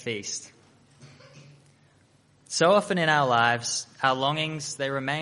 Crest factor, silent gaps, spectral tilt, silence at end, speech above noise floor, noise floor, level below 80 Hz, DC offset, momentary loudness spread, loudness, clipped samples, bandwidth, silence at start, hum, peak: 20 dB; none; -3.5 dB/octave; 0 s; 36 dB; -61 dBFS; -68 dBFS; under 0.1%; 11 LU; -25 LUFS; under 0.1%; 11.5 kHz; 0 s; none; -6 dBFS